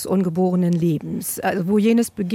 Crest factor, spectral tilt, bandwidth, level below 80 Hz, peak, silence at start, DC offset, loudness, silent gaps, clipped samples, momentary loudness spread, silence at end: 12 dB; -6.5 dB/octave; 17 kHz; -58 dBFS; -8 dBFS; 0 s; under 0.1%; -20 LUFS; none; under 0.1%; 6 LU; 0 s